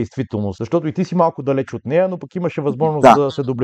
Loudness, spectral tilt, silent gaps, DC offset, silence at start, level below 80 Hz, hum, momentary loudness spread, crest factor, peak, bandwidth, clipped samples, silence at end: -17 LUFS; -7.5 dB/octave; none; under 0.1%; 0 s; -52 dBFS; none; 12 LU; 16 dB; 0 dBFS; 12.5 kHz; 0.3%; 0 s